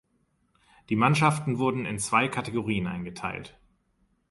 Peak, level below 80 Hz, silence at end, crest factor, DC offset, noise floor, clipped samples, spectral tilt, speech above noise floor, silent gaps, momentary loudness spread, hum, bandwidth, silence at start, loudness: -6 dBFS; -58 dBFS; 0.8 s; 22 dB; under 0.1%; -71 dBFS; under 0.1%; -5.5 dB/octave; 44 dB; none; 12 LU; none; 11.5 kHz; 0.9 s; -27 LUFS